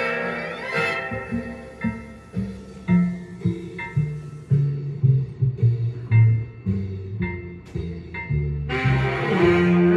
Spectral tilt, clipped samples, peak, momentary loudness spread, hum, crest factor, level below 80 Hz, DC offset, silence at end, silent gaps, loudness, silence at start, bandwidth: -8.5 dB/octave; under 0.1%; -6 dBFS; 14 LU; none; 16 dB; -42 dBFS; under 0.1%; 0 s; none; -23 LUFS; 0 s; 10 kHz